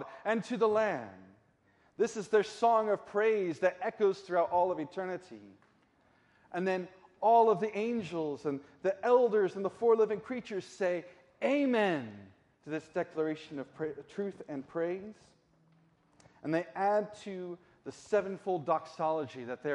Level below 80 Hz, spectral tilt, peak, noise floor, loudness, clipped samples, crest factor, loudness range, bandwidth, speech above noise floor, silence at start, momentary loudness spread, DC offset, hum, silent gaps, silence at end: -78 dBFS; -6 dB/octave; -14 dBFS; -69 dBFS; -32 LUFS; under 0.1%; 18 dB; 8 LU; 11 kHz; 37 dB; 0 s; 14 LU; under 0.1%; none; none; 0 s